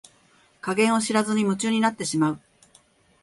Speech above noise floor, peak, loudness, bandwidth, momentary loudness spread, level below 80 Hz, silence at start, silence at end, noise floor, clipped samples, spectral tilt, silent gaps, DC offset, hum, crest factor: 37 dB; -8 dBFS; -23 LUFS; 11.5 kHz; 7 LU; -66 dBFS; 0.65 s; 0.85 s; -59 dBFS; under 0.1%; -4.5 dB/octave; none; under 0.1%; none; 16 dB